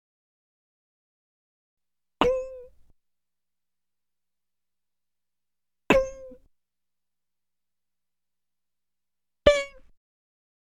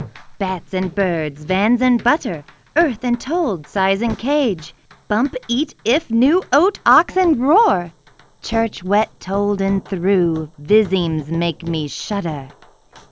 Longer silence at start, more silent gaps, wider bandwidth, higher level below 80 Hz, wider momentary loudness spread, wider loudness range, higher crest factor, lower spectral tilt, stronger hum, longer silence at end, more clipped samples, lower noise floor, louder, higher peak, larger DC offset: first, 2.2 s vs 0 s; neither; first, 13 kHz vs 8 kHz; about the same, -48 dBFS vs -46 dBFS; first, 17 LU vs 10 LU; about the same, 3 LU vs 4 LU; first, 28 dB vs 18 dB; about the same, -4.5 dB/octave vs -5.5 dB/octave; first, 60 Hz at -70 dBFS vs none; first, 0.95 s vs 0.1 s; neither; first, under -90 dBFS vs -46 dBFS; second, -24 LUFS vs -18 LUFS; second, -4 dBFS vs 0 dBFS; neither